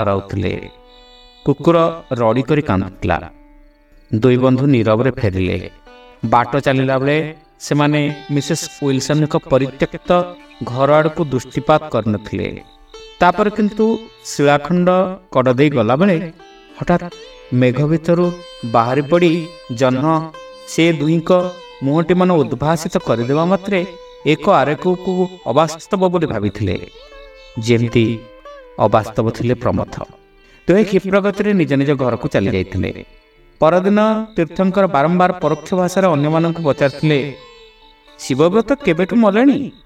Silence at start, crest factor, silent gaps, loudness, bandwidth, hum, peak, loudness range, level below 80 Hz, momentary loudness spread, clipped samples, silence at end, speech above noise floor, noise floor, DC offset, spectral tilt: 0 s; 16 dB; none; -16 LUFS; 15 kHz; none; 0 dBFS; 3 LU; -44 dBFS; 10 LU; under 0.1%; 0.15 s; 31 dB; -47 dBFS; under 0.1%; -6.5 dB/octave